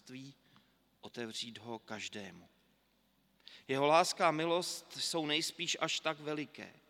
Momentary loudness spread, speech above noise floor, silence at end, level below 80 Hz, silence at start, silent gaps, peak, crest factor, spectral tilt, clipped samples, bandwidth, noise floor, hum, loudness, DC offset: 21 LU; 38 dB; 0.2 s; -84 dBFS; 0.05 s; none; -14 dBFS; 24 dB; -3 dB/octave; under 0.1%; 17 kHz; -74 dBFS; none; -35 LUFS; under 0.1%